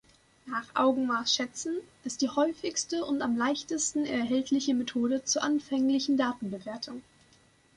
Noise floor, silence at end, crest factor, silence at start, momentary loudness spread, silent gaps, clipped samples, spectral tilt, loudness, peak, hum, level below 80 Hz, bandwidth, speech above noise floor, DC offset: -63 dBFS; 0.75 s; 16 dB; 0.45 s; 10 LU; none; under 0.1%; -2.5 dB/octave; -29 LUFS; -12 dBFS; none; -68 dBFS; 11 kHz; 33 dB; under 0.1%